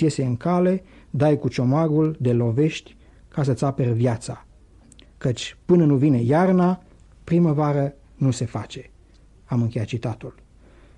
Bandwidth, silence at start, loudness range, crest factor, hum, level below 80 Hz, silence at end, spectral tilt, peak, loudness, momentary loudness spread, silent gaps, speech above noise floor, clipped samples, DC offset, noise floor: 10 kHz; 0 s; 5 LU; 16 dB; none; -52 dBFS; 0.65 s; -7.5 dB/octave; -6 dBFS; -22 LUFS; 14 LU; none; 31 dB; under 0.1%; under 0.1%; -51 dBFS